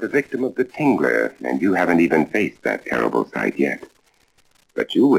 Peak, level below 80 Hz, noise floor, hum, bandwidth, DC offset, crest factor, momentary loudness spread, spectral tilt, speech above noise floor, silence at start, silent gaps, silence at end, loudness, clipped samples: -4 dBFS; -60 dBFS; -59 dBFS; none; 16 kHz; under 0.1%; 16 dB; 8 LU; -6.5 dB/octave; 40 dB; 0 s; none; 0 s; -20 LUFS; under 0.1%